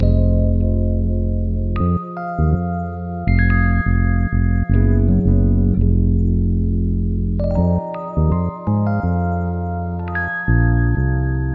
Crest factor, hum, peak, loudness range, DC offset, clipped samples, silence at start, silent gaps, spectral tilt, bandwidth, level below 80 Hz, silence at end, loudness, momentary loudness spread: 14 dB; none; -2 dBFS; 3 LU; under 0.1%; under 0.1%; 0 s; none; -12 dB/octave; 4.5 kHz; -22 dBFS; 0 s; -19 LUFS; 7 LU